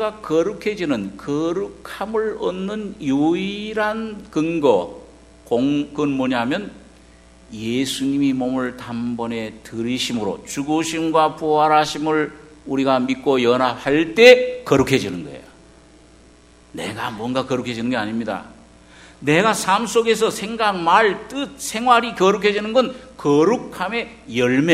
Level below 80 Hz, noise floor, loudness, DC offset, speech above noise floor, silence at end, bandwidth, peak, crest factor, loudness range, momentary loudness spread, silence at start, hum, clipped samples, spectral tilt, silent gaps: -52 dBFS; -49 dBFS; -19 LUFS; under 0.1%; 30 dB; 0 s; 14 kHz; 0 dBFS; 20 dB; 8 LU; 12 LU; 0 s; none; under 0.1%; -4.5 dB/octave; none